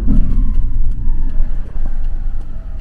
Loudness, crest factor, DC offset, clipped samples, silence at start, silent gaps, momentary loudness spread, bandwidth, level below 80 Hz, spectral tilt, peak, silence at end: -23 LUFS; 10 dB; under 0.1%; under 0.1%; 0 s; none; 9 LU; 1.7 kHz; -12 dBFS; -10 dB/octave; 0 dBFS; 0 s